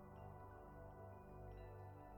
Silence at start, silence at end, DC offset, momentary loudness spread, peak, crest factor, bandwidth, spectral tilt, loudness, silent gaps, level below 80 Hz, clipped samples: 0 s; 0 s; under 0.1%; 2 LU; -46 dBFS; 12 dB; 19 kHz; -8.5 dB/octave; -58 LUFS; none; -64 dBFS; under 0.1%